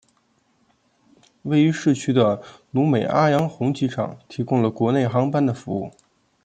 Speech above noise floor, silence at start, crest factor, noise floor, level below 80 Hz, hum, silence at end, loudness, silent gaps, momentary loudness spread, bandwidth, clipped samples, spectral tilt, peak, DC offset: 44 dB; 1.45 s; 18 dB; -64 dBFS; -62 dBFS; none; 0.55 s; -21 LUFS; none; 11 LU; 9.2 kHz; under 0.1%; -7 dB/octave; -4 dBFS; under 0.1%